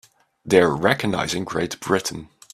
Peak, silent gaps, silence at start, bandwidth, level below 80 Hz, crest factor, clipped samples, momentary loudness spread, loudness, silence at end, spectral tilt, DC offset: 0 dBFS; none; 0.45 s; 14.5 kHz; -54 dBFS; 22 dB; under 0.1%; 9 LU; -21 LUFS; 0.3 s; -4.5 dB/octave; under 0.1%